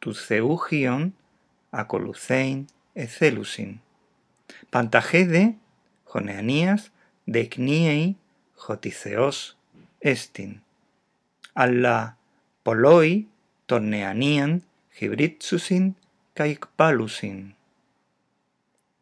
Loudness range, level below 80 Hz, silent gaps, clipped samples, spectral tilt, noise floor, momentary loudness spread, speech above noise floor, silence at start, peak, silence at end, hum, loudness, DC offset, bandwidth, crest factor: 6 LU; -78 dBFS; none; under 0.1%; -6 dB/octave; -72 dBFS; 17 LU; 50 dB; 0 s; 0 dBFS; 1.5 s; none; -23 LUFS; under 0.1%; 11 kHz; 24 dB